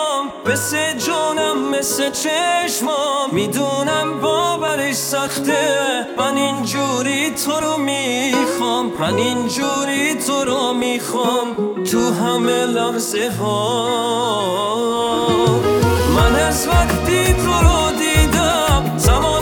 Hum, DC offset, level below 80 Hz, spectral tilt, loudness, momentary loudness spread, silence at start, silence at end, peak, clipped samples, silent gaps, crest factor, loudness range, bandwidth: none; under 0.1%; -28 dBFS; -4 dB/octave; -17 LUFS; 4 LU; 0 s; 0 s; 0 dBFS; under 0.1%; none; 16 dB; 3 LU; 19.5 kHz